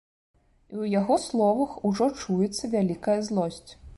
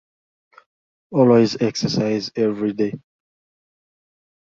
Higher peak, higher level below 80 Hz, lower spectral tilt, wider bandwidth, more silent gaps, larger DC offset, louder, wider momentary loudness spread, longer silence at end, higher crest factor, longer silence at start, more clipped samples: second, -12 dBFS vs -2 dBFS; about the same, -56 dBFS vs -60 dBFS; about the same, -6 dB/octave vs -6.5 dB/octave; first, 11.5 kHz vs 7.6 kHz; neither; neither; second, -26 LUFS vs -19 LUFS; about the same, 9 LU vs 11 LU; second, 0.05 s vs 1.4 s; about the same, 16 dB vs 20 dB; second, 0.7 s vs 1.1 s; neither